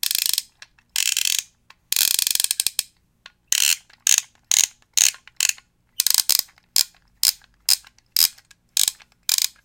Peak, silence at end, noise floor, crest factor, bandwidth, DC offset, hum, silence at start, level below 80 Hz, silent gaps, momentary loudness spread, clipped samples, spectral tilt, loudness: 0 dBFS; 0.15 s; -52 dBFS; 24 dB; 18 kHz; under 0.1%; none; 0.05 s; -64 dBFS; none; 7 LU; under 0.1%; 4.5 dB/octave; -19 LUFS